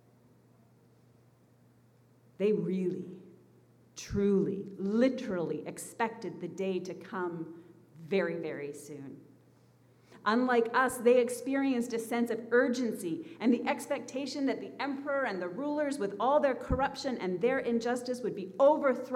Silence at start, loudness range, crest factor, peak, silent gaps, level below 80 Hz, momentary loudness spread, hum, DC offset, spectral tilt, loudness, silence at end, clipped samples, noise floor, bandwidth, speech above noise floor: 2.4 s; 8 LU; 18 dB; -14 dBFS; none; -56 dBFS; 13 LU; none; under 0.1%; -5.5 dB/octave; -31 LUFS; 0 s; under 0.1%; -63 dBFS; 15.5 kHz; 32 dB